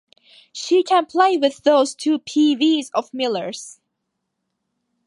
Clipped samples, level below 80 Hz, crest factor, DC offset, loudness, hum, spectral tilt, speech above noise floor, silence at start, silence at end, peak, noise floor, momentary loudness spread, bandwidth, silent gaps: under 0.1%; -74 dBFS; 18 dB; under 0.1%; -18 LUFS; none; -3 dB/octave; 59 dB; 0.55 s; 1.35 s; -2 dBFS; -77 dBFS; 15 LU; 11.5 kHz; none